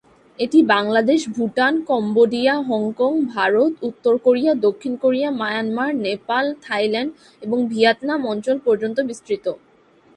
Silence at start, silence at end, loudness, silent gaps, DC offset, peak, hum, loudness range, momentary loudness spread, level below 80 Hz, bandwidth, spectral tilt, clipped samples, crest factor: 0.4 s; 0.6 s; -19 LUFS; none; under 0.1%; -2 dBFS; none; 3 LU; 8 LU; -66 dBFS; 11 kHz; -5 dB/octave; under 0.1%; 18 dB